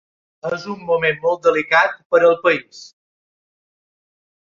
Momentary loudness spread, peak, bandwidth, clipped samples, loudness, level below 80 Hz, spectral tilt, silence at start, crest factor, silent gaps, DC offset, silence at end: 12 LU; -2 dBFS; 7.4 kHz; under 0.1%; -17 LUFS; -64 dBFS; -4.5 dB/octave; 0.45 s; 18 dB; 2.05-2.10 s; under 0.1%; 1.6 s